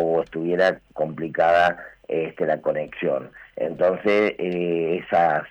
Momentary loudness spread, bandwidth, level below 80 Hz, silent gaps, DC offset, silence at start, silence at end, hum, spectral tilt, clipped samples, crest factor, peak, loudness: 10 LU; 8.8 kHz; -60 dBFS; none; under 0.1%; 0 s; 0 s; none; -7 dB/octave; under 0.1%; 14 dB; -8 dBFS; -23 LUFS